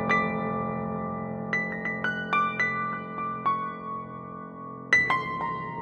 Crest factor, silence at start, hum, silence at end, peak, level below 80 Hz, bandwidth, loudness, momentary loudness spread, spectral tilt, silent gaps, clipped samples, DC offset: 20 dB; 0 s; none; 0 s; -8 dBFS; -60 dBFS; 8.8 kHz; -28 LUFS; 15 LU; -5.5 dB/octave; none; under 0.1%; under 0.1%